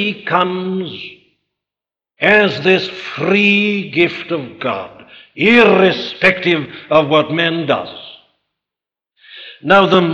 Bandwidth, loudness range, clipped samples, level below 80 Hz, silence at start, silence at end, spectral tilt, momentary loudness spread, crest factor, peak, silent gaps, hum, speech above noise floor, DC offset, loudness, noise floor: 8.2 kHz; 3 LU; under 0.1%; -56 dBFS; 0 s; 0 s; -6.5 dB/octave; 17 LU; 14 dB; 0 dBFS; none; none; 74 dB; under 0.1%; -14 LUFS; -88 dBFS